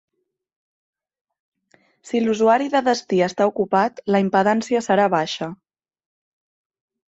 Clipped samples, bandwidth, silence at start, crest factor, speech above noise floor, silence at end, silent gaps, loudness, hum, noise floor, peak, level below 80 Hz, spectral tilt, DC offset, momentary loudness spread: under 0.1%; 8.2 kHz; 2.05 s; 18 dB; 42 dB; 1.6 s; none; -19 LUFS; none; -61 dBFS; -4 dBFS; -66 dBFS; -5.5 dB/octave; under 0.1%; 7 LU